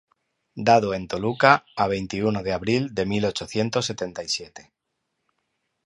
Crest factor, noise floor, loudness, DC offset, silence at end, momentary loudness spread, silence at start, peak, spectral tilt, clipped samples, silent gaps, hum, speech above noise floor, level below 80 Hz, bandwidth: 24 dB; -78 dBFS; -23 LUFS; under 0.1%; 1.25 s; 10 LU; 0.55 s; 0 dBFS; -5 dB/octave; under 0.1%; none; none; 55 dB; -54 dBFS; 11.5 kHz